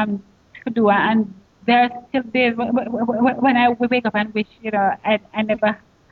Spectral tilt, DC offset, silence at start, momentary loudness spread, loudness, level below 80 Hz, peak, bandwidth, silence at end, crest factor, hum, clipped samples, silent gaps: -8 dB/octave; under 0.1%; 0 s; 9 LU; -19 LUFS; -58 dBFS; -4 dBFS; 4.7 kHz; 0.35 s; 16 dB; none; under 0.1%; none